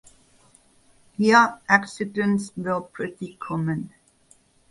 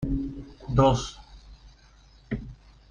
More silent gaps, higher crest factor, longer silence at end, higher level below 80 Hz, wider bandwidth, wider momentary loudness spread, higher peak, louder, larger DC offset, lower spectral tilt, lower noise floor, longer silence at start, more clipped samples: neither; about the same, 22 dB vs 22 dB; first, 0.85 s vs 0.35 s; second, -64 dBFS vs -40 dBFS; first, 11.5 kHz vs 10 kHz; second, 16 LU vs 22 LU; first, -2 dBFS vs -6 dBFS; first, -23 LUFS vs -27 LUFS; neither; about the same, -5.5 dB/octave vs -6.5 dB/octave; first, -59 dBFS vs -55 dBFS; first, 1.2 s vs 0 s; neither